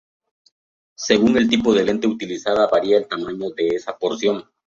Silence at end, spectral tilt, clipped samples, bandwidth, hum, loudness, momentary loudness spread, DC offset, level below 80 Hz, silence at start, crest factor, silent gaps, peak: 0.25 s; -4.5 dB/octave; under 0.1%; 7.8 kHz; none; -19 LUFS; 10 LU; under 0.1%; -54 dBFS; 1 s; 18 dB; none; -2 dBFS